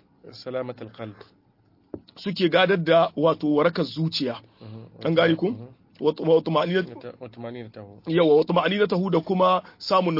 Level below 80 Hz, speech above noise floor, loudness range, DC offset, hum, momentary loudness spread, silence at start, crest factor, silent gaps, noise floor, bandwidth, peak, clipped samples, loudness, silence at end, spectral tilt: -66 dBFS; 39 dB; 2 LU; under 0.1%; none; 20 LU; 0.25 s; 18 dB; none; -61 dBFS; 5.8 kHz; -6 dBFS; under 0.1%; -22 LUFS; 0 s; -7.5 dB/octave